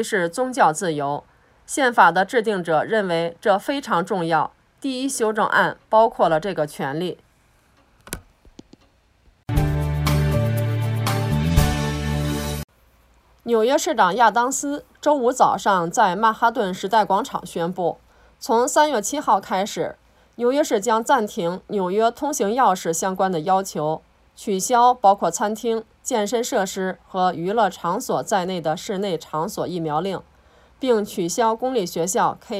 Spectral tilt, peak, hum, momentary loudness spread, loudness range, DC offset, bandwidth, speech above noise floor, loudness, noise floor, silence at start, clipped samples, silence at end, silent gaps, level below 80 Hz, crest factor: -4.5 dB/octave; 0 dBFS; none; 10 LU; 5 LU; under 0.1%; 16 kHz; 38 dB; -21 LUFS; -58 dBFS; 0 s; under 0.1%; 0 s; 12.64-12.68 s; -40 dBFS; 20 dB